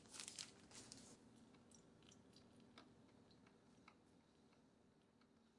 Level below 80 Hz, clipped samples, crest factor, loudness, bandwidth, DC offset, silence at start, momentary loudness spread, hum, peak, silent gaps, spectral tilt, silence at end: -88 dBFS; under 0.1%; 34 dB; -61 LUFS; 12 kHz; under 0.1%; 0 s; 15 LU; none; -30 dBFS; none; -2 dB/octave; 0 s